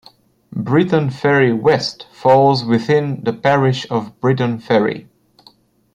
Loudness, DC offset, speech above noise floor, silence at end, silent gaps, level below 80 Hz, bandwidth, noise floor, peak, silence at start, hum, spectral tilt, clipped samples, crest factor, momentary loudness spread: -16 LUFS; under 0.1%; 36 dB; 0.95 s; none; -56 dBFS; 9.8 kHz; -51 dBFS; -2 dBFS; 0.5 s; none; -7 dB/octave; under 0.1%; 14 dB; 9 LU